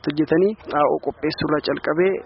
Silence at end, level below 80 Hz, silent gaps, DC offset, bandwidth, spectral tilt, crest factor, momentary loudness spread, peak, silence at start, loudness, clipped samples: 0 s; -52 dBFS; none; under 0.1%; 5.8 kHz; -4.5 dB/octave; 14 dB; 5 LU; -6 dBFS; 0.05 s; -21 LUFS; under 0.1%